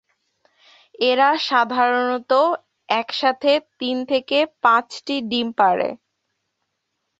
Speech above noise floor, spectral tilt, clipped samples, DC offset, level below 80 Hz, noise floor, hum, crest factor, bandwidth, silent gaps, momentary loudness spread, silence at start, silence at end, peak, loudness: 57 dB; -4 dB/octave; under 0.1%; under 0.1%; -70 dBFS; -76 dBFS; none; 18 dB; 8 kHz; none; 9 LU; 1 s; 1.25 s; -2 dBFS; -19 LUFS